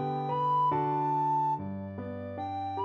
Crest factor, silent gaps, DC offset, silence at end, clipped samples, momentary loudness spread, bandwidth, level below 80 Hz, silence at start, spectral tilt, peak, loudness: 12 dB; none; under 0.1%; 0 s; under 0.1%; 11 LU; 6.6 kHz; -70 dBFS; 0 s; -9 dB/octave; -18 dBFS; -30 LUFS